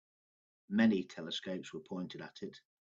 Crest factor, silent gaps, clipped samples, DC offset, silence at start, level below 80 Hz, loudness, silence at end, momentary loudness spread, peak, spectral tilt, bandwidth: 22 dB; none; under 0.1%; under 0.1%; 0.7 s; -80 dBFS; -37 LUFS; 0.35 s; 17 LU; -16 dBFS; -6 dB/octave; 7.6 kHz